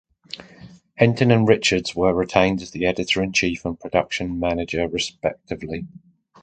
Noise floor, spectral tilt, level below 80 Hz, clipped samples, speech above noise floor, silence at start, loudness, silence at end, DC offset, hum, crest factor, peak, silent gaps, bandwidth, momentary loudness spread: -46 dBFS; -5 dB/octave; -46 dBFS; under 0.1%; 25 dB; 0.35 s; -21 LUFS; 0.55 s; under 0.1%; none; 22 dB; 0 dBFS; none; 9.4 kHz; 16 LU